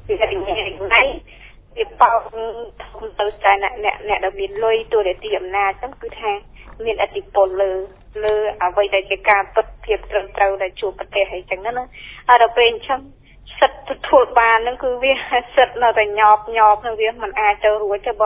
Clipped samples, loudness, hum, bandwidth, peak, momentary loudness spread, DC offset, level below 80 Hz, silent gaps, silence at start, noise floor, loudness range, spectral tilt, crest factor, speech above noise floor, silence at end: under 0.1%; -18 LUFS; none; 4 kHz; 0 dBFS; 14 LU; under 0.1%; -42 dBFS; none; 0.05 s; -43 dBFS; 6 LU; -6.5 dB/octave; 18 dB; 25 dB; 0 s